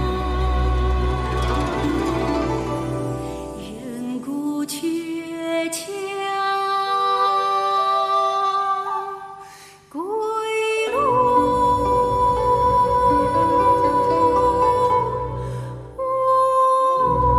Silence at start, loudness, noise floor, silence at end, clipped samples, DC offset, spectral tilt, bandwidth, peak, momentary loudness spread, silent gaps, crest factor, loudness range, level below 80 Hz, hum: 0 s; -20 LUFS; -44 dBFS; 0 s; under 0.1%; under 0.1%; -5.5 dB/octave; 14 kHz; -6 dBFS; 12 LU; none; 14 dB; 8 LU; -32 dBFS; none